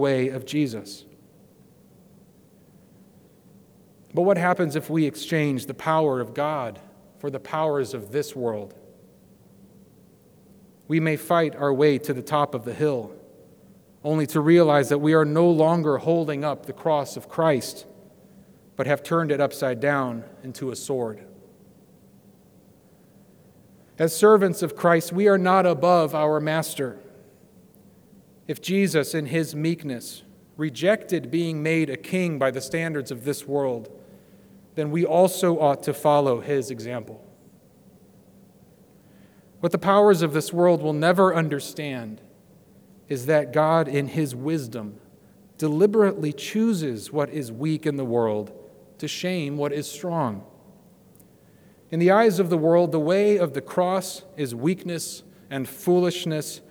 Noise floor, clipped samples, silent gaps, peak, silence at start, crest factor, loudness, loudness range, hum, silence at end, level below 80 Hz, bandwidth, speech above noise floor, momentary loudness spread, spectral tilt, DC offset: -54 dBFS; under 0.1%; none; -4 dBFS; 0 s; 20 dB; -23 LUFS; 10 LU; none; 0.1 s; -70 dBFS; over 20 kHz; 32 dB; 14 LU; -6 dB/octave; under 0.1%